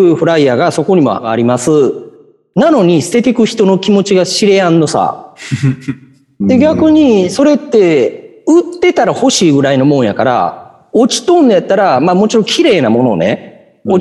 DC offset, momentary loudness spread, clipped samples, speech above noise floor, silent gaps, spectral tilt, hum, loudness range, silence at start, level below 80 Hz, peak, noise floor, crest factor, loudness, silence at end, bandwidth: under 0.1%; 8 LU; under 0.1%; 30 dB; none; -5.5 dB/octave; none; 2 LU; 0 s; -52 dBFS; 0 dBFS; -40 dBFS; 10 dB; -10 LUFS; 0 s; 12 kHz